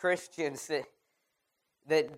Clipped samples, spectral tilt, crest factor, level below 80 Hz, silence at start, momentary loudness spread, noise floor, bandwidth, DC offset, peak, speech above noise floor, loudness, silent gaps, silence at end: under 0.1%; -3.5 dB/octave; 20 dB; -82 dBFS; 0 s; 6 LU; -81 dBFS; 15.5 kHz; under 0.1%; -16 dBFS; 49 dB; -34 LUFS; none; 0 s